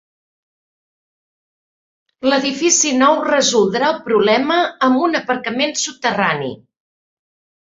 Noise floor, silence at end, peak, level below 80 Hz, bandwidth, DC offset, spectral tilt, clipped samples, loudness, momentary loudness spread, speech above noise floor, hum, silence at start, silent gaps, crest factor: under -90 dBFS; 1.1 s; 0 dBFS; -62 dBFS; 7.8 kHz; under 0.1%; -2.5 dB/octave; under 0.1%; -16 LUFS; 6 LU; over 74 dB; none; 2.2 s; none; 18 dB